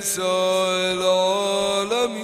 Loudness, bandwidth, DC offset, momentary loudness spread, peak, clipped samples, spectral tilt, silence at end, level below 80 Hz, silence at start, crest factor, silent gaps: -20 LUFS; 15.5 kHz; under 0.1%; 2 LU; -8 dBFS; under 0.1%; -2.5 dB/octave; 0 s; -62 dBFS; 0 s; 14 dB; none